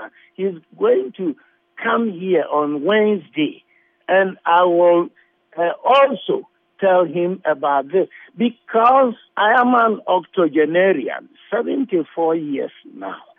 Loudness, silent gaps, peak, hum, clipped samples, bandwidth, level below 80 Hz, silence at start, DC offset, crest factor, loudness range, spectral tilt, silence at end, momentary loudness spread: -18 LUFS; none; -4 dBFS; none; under 0.1%; 3.8 kHz; -74 dBFS; 0 s; under 0.1%; 14 dB; 3 LU; -8 dB/octave; 0.2 s; 13 LU